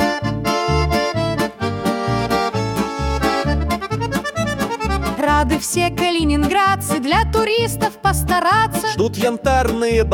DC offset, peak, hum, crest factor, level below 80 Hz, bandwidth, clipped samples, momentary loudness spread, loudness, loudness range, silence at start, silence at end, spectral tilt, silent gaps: under 0.1%; -4 dBFS; none; 14 dB; -30 dBFS; 18 kHz; under 0.1%; 5 LU; -18 LUFS; 3 LU; 0 s; 0 s; -5 dB/octave; none